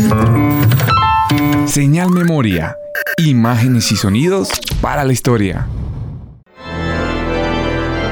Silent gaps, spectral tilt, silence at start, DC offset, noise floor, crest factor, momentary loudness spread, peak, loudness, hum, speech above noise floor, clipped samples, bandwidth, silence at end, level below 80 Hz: none; -5.5 dB/octave; 0 s; under 0.1%; -34 dBFS; 10 dB; 11 LU; -2 dBFS; -14 LUFS; none; 21 dB; under 0.1%; 20 kHz; 0 s; -30 dBFS